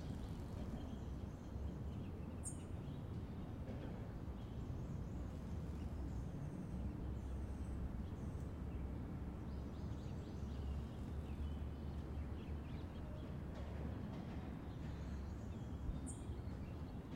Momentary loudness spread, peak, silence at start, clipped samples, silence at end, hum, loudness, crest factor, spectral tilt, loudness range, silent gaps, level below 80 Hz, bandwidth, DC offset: 2 LU; -34 dBFS; 0 s; under 0.1%; 0 s; none; -48 LUFS; 12 dB; -7 dB/octave; 1 LU; none; -52 dBFS; 13 kHz; under 0.1%